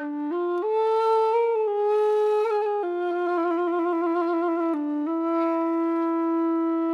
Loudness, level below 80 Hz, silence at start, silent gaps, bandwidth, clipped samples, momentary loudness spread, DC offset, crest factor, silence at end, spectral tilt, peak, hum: -24 LUFS; under -90 dBFS; 0 s; none; 6 kHz; under 0.1%; 5 LU; under 0.1%; 10 dB; 0 s; -5 dB/octave; -12 dBFS; none